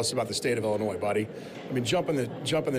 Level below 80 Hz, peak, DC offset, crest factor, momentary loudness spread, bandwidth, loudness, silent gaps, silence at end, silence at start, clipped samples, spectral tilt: -62 dBFS; -16 dBFS; under 0.1%; 12 dB; 6 LU; 15.5 kHz; -29 LUFS; none; 0 s; 0 s; under 0.1%; -4.5 dB/octave